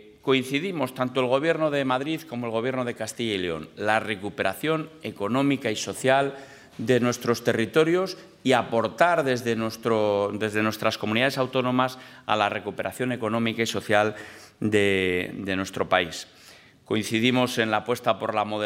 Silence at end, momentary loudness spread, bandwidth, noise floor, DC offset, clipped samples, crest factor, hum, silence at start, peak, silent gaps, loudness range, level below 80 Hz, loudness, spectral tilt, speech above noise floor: 0 s; 8 LU; 16 kHz; -51 dBFS; under 0.1%; under 0.1%; 22 dB; none; 0.05 s; -4 dBFS; none; 3 LU; -68 dBFS; -25 LUFS; -5 dB/octave; 27 dB